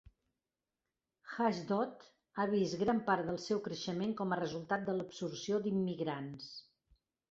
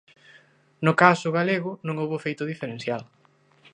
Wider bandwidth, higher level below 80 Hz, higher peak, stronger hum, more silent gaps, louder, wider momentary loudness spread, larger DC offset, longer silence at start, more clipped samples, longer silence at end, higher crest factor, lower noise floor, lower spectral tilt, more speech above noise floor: second, 7.8 kHz vs 10 kHz; about the same, -72 dBFS vs -72 dBFS; second, -18 dBFS vs 0 dBFS; neither; neither; second, -37 LUFS vs -24 LUFS; about the same, 11 LU vs 13 LU; neither; first, 1.25 s vs 0.8 s; neither; about the same, 0.7 s vs 0.7 s; about the same, 20 dB vs 24 dB; first, under -90 dBFS vs -59 dBFS; second, -5 dB/octave vs -6.5 dB/octave; first, over 54 dB vs 35 dB